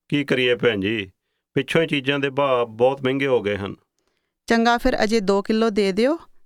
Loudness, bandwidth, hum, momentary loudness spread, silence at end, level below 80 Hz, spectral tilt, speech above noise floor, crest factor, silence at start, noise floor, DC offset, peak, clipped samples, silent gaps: -21 LUFS; 14.5 kHz; none; 8 LU; 0.25 s; -44 dBFS; -5.5 dB/octave; 52 dB; 18 dB; 0.1 s; -72 dBFS; under 0.1%; -4 dBFS; under 0.1%; none